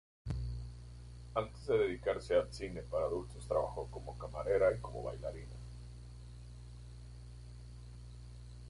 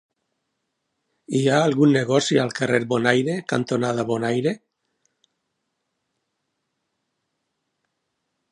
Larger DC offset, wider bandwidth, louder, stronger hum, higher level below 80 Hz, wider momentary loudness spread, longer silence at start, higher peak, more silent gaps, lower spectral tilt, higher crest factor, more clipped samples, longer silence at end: neither; about the same, 11.5 kHz vs 11 kHz; second, -38 LUFS vs -21 LUFS; first, 60 Hz at -50 dBFS vs none; first, -50 dBFS vs -68 dBFS; first, 19 LU vs 7 LU; second, 0.25 s vs 1.3 s; second, -18 dBFS vs -2 dBFS; neither; about the same, -6.5 dB/octave vs -5.5 dB/octave; about the same, 20 dB vs 22 dB; neither; second, 0 s vs 3.95 s